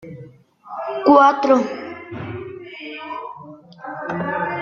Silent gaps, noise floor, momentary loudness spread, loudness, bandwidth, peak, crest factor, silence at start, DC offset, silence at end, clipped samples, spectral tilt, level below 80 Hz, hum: none; -43 dBFS; 23 LU; -18 LUFS; 7.2 kHz; 0 dBFS; 20 dB; 0 s; under 0.1%; 0 s; under 0.1%; -6.5 dB/octave; -64 dBFS; none